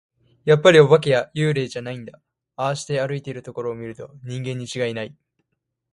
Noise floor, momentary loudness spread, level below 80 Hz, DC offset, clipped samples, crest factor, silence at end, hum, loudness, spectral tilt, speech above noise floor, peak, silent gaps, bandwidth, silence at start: -77 dBFS; 20 LU; -62 dBFS; under 0.1%; under 0.1%; 20 dB; 0.85 s; none; -20 LUFS; -5.5 dB/octave; 57 dB; 0 dBFS; none; 11.5 kHz; 0.45 s